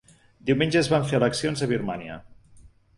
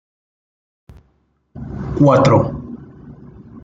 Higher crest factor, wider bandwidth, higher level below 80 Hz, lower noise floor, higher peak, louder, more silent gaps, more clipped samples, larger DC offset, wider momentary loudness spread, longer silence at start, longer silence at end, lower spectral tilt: about the same, 18 dB vs 18 dB; first, 11.5 kHz vs 7.8 kHz; second, -54 dBFS vs -42 dBFS; second, -52 dBFS vs -61 dBFS; second, -8 dBFS vs -2 dBFS; second, -24 LUFS vs -14 LUFS; neither; neither; neither; second, 14 LU vs 23 LU; second, 0.45 s vs 1.55 s; first, 0.3 s vs 0.05 s; second, -5.5 dB/octave vs -8 dB/octave